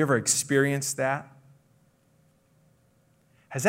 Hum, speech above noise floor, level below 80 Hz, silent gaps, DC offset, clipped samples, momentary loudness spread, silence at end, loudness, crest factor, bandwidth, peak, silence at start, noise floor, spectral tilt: none; 39 dB; -74 dBFS; none; under 0.1%; under 0.1%; 10 LU; 0 s; -25 LUFS; 20 dB; 16 kHz; -10 dBFS; 0 s; -64 dBFS; -4 dB/octave